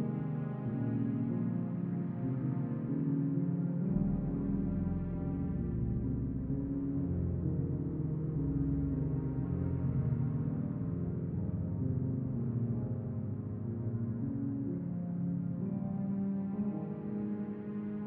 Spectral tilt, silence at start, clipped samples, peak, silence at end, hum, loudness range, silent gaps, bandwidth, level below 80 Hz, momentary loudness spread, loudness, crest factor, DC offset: -13 dB/octave; 0 s; under 0.1%; -20 dBFS; 0 s; none; 2 LU; none; 3 kHz; -48 dBFS; 4 LU; -36 LUFS; 14 dB; under 0.1%